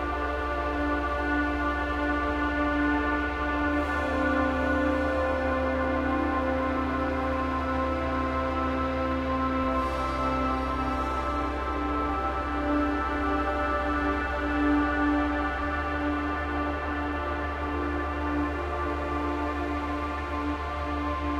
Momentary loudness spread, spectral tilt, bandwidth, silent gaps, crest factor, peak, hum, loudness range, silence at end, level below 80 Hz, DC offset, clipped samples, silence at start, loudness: 5 LU; -7 dB/octave; 11 kHz; none; 14 dB; -14 dBFS; none; 3 LU; 0 s; -36 dBFS; under 0.1%; under 0.1%; 0 s; -28 LUFS